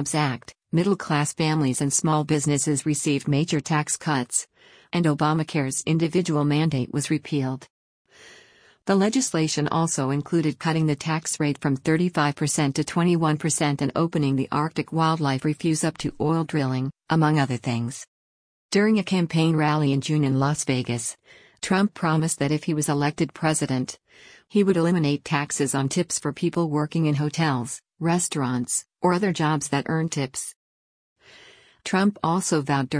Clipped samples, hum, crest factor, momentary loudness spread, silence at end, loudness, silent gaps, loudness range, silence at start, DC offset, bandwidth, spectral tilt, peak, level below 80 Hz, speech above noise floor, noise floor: under 0.1%; none; 16 dB; 6 LU; 0 s; -23 LUFS; 7.70-8.05 s, 18.08-18.69 s, 30.56-31.16 s; 2 LU; 0 s; under 0.1%; 10.5 kHz; -5 dB/octave; -8 dBFS; -60 dBFS; 31 dB; -55 dBFS